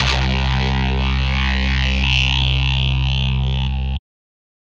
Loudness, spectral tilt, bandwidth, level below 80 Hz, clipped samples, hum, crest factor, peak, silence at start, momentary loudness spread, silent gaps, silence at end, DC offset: -18 LUFS; -5 dB/octave; 7.4 kHz; -20 dBFS; under 0.1%; none; 14 dB; -4 dBFS; 0 s; 6 LU; none; 0.8 s; under 0.1%